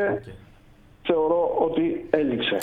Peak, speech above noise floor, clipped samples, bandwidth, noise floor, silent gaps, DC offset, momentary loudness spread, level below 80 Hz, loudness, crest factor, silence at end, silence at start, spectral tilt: -4 dBFS; 29 dB; under 0.1%; 4.6 kHz; -52 dBFS; none; under 0.1%; 10 LU; -52 dBFS; -24 LUFS; 22 dB; 0 s; 0 s; -7 dB/octave